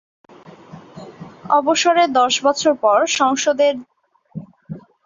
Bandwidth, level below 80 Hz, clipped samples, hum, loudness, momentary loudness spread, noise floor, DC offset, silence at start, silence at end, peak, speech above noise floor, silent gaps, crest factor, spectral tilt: 7.8 kHz; -64 dBFS; under 0.1%; none; -16 LUFS; 22 LU; -41 dBFS; under 0.1%; 0.75 s; 0.25 s; -2 dBFS; 25 dB; none; 16 dB; -2.5 dB/octave